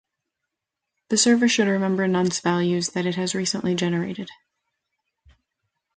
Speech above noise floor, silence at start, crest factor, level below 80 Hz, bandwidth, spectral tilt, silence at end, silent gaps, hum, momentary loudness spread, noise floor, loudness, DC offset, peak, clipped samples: 62 dB; 1.1 s; 16 dB; -64 dBFS; 9.6 kHz; -4 dB/octave; 1.65 s; none; none; 8 LU; -84 dBFS; -22 LUFS; under 0.1%; -8 dBFS; under 0.1%